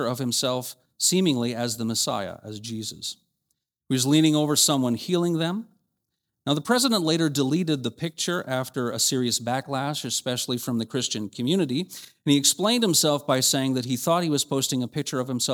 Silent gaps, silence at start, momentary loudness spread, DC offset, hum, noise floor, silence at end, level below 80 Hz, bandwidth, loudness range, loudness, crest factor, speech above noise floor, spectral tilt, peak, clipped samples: none; 0 s; 12 LU; under 0.1%; none; -81 dBFS; 0 s; -70 dBFS; over 20 kHz; 4 LU; -24 LUFS; 20 dB; 56 dB; -3.5 dB/octave; -6 dBFS; under 0.1%